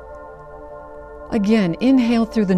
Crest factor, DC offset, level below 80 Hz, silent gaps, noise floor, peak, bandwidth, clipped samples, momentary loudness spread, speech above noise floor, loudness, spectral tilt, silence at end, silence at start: 14 dB; under 0.1%; -44 dBFS; none; -37 dBFS; -4 dBFS; 10 kHz; under 0.1%; 22 LU; 21 dB; -17 LUFS; -7.5 dB/octave; 0 s; 0 s